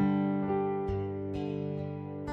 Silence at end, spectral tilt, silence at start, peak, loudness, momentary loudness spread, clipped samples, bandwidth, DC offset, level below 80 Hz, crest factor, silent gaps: 0 s; -10 dB/octave; 0 s; -18 dBFS; -33 LUFS; 8 LU; under 0.1%; 5.8 kHz; under 0.1%; -52 dBFS; 14 dB; none